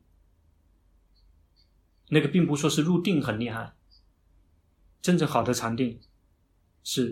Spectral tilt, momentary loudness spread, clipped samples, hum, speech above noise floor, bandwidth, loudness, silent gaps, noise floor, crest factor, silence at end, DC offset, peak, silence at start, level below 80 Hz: -5.5 dB/octave; 12 LU; under 0.1%; none; 41 dB; 16 kHz; -26 LUFS; none; -66 dBFS; 22 dB; 0 s; under 0.1%; -6 dBFS; 2.1 s; -60 dBFS